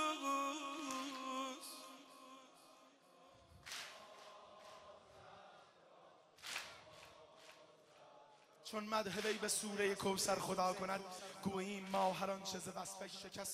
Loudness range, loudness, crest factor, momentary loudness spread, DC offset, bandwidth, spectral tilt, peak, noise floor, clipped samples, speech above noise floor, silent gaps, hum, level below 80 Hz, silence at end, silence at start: 16 LU; -43 LUFS; 22 dB; 22 LU; under 0.1%; 15.5 kHz; -3 dB/octave; -24 dBFS; -67 dBFS; under 0.1%; 25 dB; none; none; -80 dBFS; 0 s; 0 s